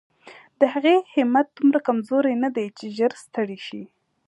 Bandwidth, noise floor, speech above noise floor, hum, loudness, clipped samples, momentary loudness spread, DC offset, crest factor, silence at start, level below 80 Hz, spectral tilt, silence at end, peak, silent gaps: 11.5 kHz; -49 dBFS; 27 dB; none; -22 LUFS; under 0.1%; 11 LU; under 0.1%; 18 dB; 0.25 s; -78 dBFS; -6 dB/octave; 0.45 s; -4 dBFS; none